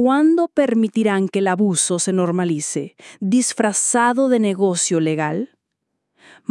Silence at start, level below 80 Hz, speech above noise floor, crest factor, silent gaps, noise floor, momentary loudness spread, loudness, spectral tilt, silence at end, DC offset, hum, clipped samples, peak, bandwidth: 0 s; -74 dBFS; 58 dB; 16 dB; none; -76 dBFS; 10 LU; -18 LUFS; -4.5 dB/octave; 1.05 s; under 0.1%; none; under 0.1%; -4 dBFS; 12 kHz